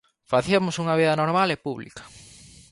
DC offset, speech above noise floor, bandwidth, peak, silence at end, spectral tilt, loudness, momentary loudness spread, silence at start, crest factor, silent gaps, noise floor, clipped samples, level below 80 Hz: under 0.1%; 26 dB; 11.5 kHz; -6 dBFS; 0.55 s; -5.5 dB/octave; -23 LUFS; 16 LU; 0.3 s; 18 dB; none; -48 dBFS; under 0.1%; -58 dBFS